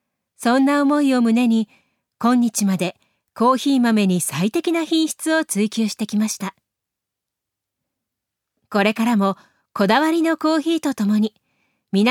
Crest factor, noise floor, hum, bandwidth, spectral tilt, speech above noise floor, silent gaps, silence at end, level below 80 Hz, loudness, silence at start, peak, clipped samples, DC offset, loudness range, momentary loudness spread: 16 dB; -83 dBFS; none; 17 kHz; -5 dB/octave; 65 dB; none; 0 s; -72 dBFS; -19 LUFS; 0.4 s; -4 dBFS; under 0.1%; under 0.1%; 6 LU; 8 LU